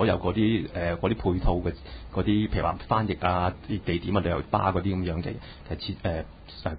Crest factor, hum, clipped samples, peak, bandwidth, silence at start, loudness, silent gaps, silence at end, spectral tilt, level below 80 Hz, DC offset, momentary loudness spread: 18 dB; none; under 0.1%; -8 dBFS; 5 kHz; 0 s; -28 LUFS; none; 0 s; -11.5 dB/octave; -38 dBFS; under 0.1%; 10 LU